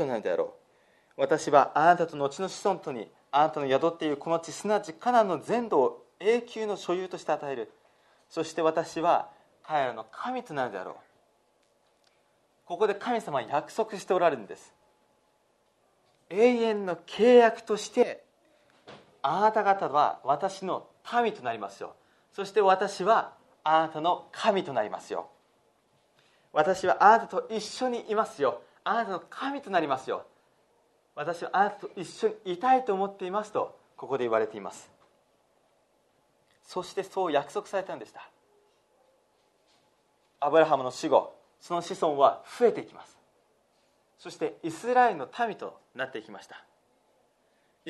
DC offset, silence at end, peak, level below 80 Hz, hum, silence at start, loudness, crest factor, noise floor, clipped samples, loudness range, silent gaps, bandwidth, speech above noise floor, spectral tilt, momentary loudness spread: under 0.1%; 0 s; -6 dBFS; -78 dBFS; none; 0 s; -28 LUFS; 24 dB; -69 dBFS; under 0.1%; 9 LU; none; 12 kHz; 42 dB; -4.5 dB/octave; 16 LU